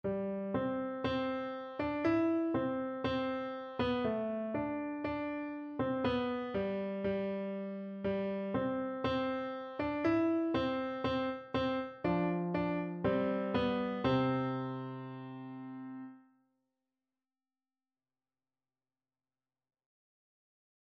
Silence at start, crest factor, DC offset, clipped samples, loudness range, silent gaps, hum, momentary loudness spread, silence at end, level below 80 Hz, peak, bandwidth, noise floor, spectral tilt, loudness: 0.05 s; 16 dB; under 0.1%; under 0.1%; 7 LU; none; none; 9 LU; 4.75 s; -62 dBFS; -20 dBFS; 6.8 kHz; under -90 dBFS; -8.5 dB/octave; -35 LUFS